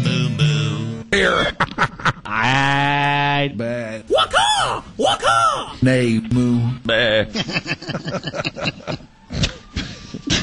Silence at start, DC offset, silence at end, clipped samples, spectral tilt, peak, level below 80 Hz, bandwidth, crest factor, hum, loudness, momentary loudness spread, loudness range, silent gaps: 0 s; under 0.1%; 0 s; under 0.1%; -4.5 dB/octave; -4 dBFS; -40 dBFS; 11.5 kHz; 14 dB; none; -18 LUFS; 11 LU; 4 LU; none